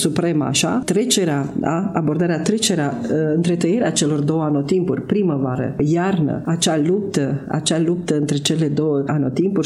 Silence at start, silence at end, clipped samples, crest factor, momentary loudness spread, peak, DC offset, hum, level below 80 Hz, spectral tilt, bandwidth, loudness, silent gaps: 0 s; 0 s; under 0.1%; 16 dB; 3 LU; -2 dBFS; under 0.1%; none; -54 dBFS; -5 dB/octave; 13.5 kHz; -19 LUFS; none